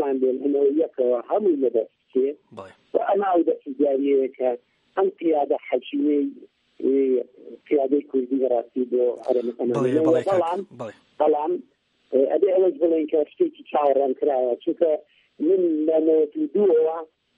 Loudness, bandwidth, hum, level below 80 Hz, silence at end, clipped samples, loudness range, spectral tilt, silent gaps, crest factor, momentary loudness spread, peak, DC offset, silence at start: -22 LUFS; 7.4 kHz; none; -76 dBFS; 0.35 s; under 0.1%; 2 LU; -8 dB/octave; none; 16 dB; 8 LU; -6 dBFS; under 0.1%; 0 s